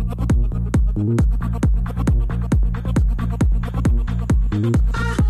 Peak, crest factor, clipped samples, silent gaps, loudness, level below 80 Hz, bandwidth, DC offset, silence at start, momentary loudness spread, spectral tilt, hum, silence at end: -8 dBFS; 10 dB; under 0.1%; none; -20 LUFS; -20 dBFS; 11 kHz; under 0.1%; 0 s; 2 LU; -8 dB/octave; none; 0 s